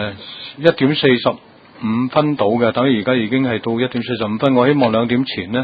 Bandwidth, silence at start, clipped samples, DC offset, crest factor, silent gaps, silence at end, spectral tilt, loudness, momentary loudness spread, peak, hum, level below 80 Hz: 5 kHz; 0 s; under 0.1%; under 0.1%; 16 dB; none; 0 s; -9 dB/octave; -16 LUFS; 8 LU; 0 dBFS; none; -52 dBFS